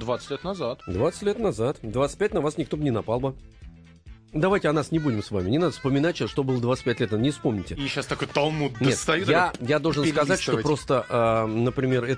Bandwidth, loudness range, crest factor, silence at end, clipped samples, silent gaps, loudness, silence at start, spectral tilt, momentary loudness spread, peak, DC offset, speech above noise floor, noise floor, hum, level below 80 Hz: 10.5 kHz; 4 LU; 18 dB; 0 s; under 0.1%; none; -25 LUFS; 0 s; -5.5 dB/octave; 7 LU; -6 dBFS; under 0.1%; 23 dB; -47 dBFS; none; -48 dBFS